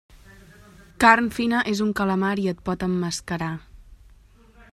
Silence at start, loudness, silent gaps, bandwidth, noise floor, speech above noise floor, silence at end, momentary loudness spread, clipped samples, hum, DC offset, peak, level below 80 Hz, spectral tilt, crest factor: 0.15 s; -22 LUFS; none; 14.5 kHz; -52 dBFS; 30 dB; 0.75 s; 12 LU; under 0.1%; none; under 0.1%; 0 dBFS; -50 dBFS; -5 dB/octave; 24 dB